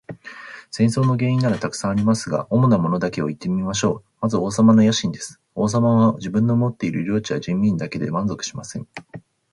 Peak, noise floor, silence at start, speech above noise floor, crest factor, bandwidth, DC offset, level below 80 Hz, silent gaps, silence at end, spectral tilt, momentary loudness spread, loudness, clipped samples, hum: -4 dBFS; -39 dBFS; 0.1 s; 19 dB; 16 dB; 11.5 kHz; under 0.1%; -52 dBFS; none; 0.35 s; -6.5 dB/octave; 16 LU; -20 LUFS; under 0.1%; none